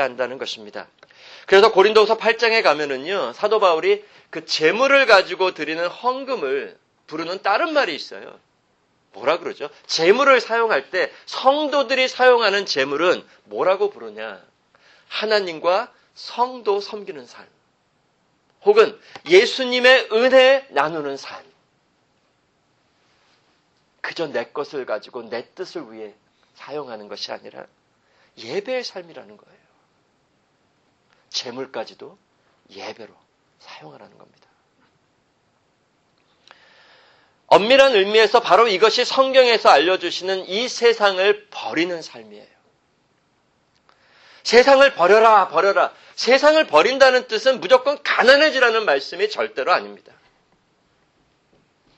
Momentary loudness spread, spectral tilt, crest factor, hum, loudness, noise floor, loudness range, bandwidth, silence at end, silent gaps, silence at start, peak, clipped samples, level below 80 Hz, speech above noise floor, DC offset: 20 LU; -2.5 dB/octave; 20 dB; none; -17 LUFS; -65 dBFS; 18 LU; 8.6 kHz; 2 s; none; 0 s; 0 dBFS; under 0.1%; -66 dBFS; 46 dB; under 0.1%